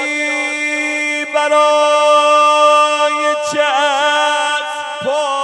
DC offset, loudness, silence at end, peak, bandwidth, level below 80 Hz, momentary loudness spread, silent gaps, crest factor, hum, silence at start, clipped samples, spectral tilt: under 0.1%; -13 LUFS; 0 s; 0 dBFS; 11.5 kHz; -72 dBFS; 8 LU; none; 14 dB; none; 0 s; under 0.1%; -1 dB/octave